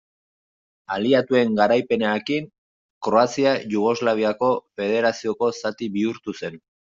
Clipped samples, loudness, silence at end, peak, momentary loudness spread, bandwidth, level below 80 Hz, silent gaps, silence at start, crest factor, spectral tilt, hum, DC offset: under 0.1%; -22 LUFS; 0.4 s; -4 dBFS; 12 LU; 7.6 kHz; -66 dBFS; 2.58-3.01 s; 0.9 s; 18 dB; -5.5 dB/octave; none; under 0.1%